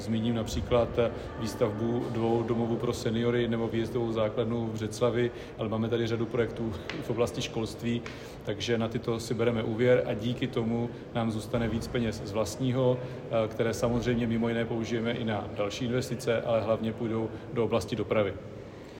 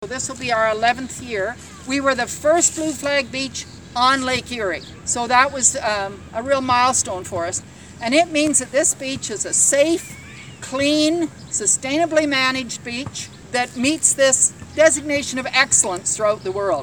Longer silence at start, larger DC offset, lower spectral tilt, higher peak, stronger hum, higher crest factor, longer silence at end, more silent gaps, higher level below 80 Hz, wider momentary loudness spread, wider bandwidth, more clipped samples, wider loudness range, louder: about the same, 0 s vs 0 s; second, under 0.1% vs 0.1%; first, -6.5 dB/octave vs -2 dB/octave; second, -12 dBFS vs 0 dBFS; neither; about the same, 18 dB vs 20 dB; about the same, 0 s vs 0 s; neither; about the same, -50 dBFS vs -50 dBFS; second, 6 LU vs 12 LU; second, 16 kHz vs over 20 kHz; neither; about the same, 2 LU vs 3 LU; second, -30 LUFS vs -18 LUFS